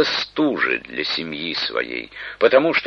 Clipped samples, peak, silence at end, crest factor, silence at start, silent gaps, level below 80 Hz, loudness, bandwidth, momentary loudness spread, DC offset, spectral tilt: under 0.1%; -2 dBFS; 0 s; 18 dB; 0 s; none; -58 dBFS; -20 LUFS; 6.8 kHz; 11 LU; under 0.1%; -4.5 dB/octave